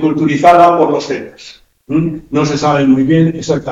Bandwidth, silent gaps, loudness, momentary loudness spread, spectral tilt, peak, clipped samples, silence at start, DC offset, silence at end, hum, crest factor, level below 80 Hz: 8.8 kHz; none; -11 LUFS; 11 LU; -6.5 dB/octave; 0 dBFS; 1%; 0 s; under 0.1%; 0 s; none; 12 dB; -44 dBFS